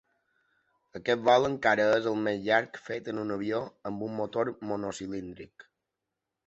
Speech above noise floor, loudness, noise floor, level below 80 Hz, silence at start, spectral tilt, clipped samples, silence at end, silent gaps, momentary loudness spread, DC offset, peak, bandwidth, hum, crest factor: 57 dB; -29 LUFS; -87 dBFS; -66 dBFS; 0.95 s; -5 dB/octave; under 0.1%; 0.85 s; none; 14 LU; under 0.1%; -8 dBFS; 8.2 kHz; none; 22 dB